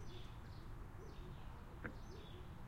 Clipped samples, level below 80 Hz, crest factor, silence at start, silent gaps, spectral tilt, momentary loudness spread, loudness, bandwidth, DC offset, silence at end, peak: under 0.1%; -56 dBFS; 20 dB; 0 s; none; -6 dB/octave; 3 LU; -55 LUFS; 16 kHz; under 0.1%; 0 s; -30 dBFS